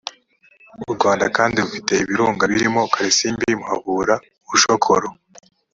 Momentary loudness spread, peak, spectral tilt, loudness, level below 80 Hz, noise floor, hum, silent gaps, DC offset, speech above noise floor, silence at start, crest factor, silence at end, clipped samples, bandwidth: 7 LU; 0 dBFS; -3 dB/octave; -18 LUFS; -54 dBFS; -54 dBFS; none; none; under 0.1%; 36 dB; 0.05 s; 18 dB; 0.6 s; under 0.1%; 7.8 kHz